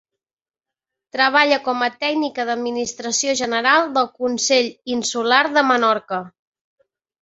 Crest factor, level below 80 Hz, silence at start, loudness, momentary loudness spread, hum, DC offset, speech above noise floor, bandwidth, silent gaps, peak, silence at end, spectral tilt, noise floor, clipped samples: 20 dB; -66 dBFS; 1.15 s; -18 LUFS; 8 LU; none; under 0.1%; over 71 dB; 8.2 kHz; none; -2 dBFS; 0.9 s; -1.5 dB/octave; under -90 dBFS; under 0.1%